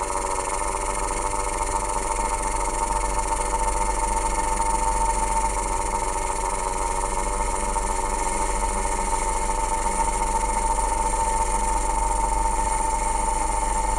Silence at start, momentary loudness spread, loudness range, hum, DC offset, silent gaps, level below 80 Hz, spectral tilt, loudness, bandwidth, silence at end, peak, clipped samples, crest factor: 0 s; 2 LU; 2 LU; none; under 0.1%; none; -28 dBFS; -3 dB/octave; -24 LUFS; 13.5 kHz; 0 s; -10 dBFS; under 0.1%; 14 dB